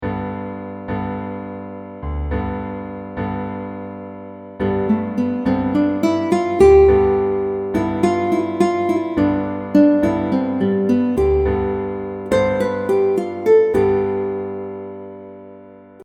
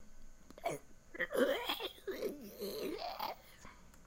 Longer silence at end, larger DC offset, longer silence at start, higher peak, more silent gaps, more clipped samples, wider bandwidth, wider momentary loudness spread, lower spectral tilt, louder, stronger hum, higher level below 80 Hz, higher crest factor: about the same, 0 s vs 0 s; neither; about the same, 0 s vs 0 s; first, -2 dBFS vs -20 dBFS; neither; neither; second, 11.5 kHz vs 16 kHz; second, 17 LU vs 21 LU; first, -8 dB/octave vs -3.5 dB/octave; first, -18 LUFS vs -40 LUFS; first, 50 Hz at -45 dBFS vs none; first, -34 dBFS vs -60 dBFS; second, 16 dB vs 22 dB